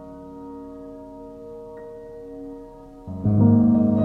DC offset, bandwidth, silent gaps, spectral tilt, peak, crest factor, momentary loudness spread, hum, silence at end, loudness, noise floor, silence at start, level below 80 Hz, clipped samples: under 0.1%; 2 kHz; none; -12.5 dB/octave; -6 dBFS; 18 dB; 23 LU; none; 0 s; -18 LUFS; -42 dBFS; 0 s; -50 dBFS; under 0.1%